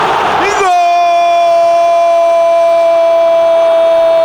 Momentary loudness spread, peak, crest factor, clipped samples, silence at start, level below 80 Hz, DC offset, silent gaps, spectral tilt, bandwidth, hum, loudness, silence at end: 1 LU; -2 dBFS; 6 dB; under 0.1%; 0 s; -48 dBFS; under 0.1%; none; -3 dB/octave; over 20 kHz; none; -9 LUFS; 0 s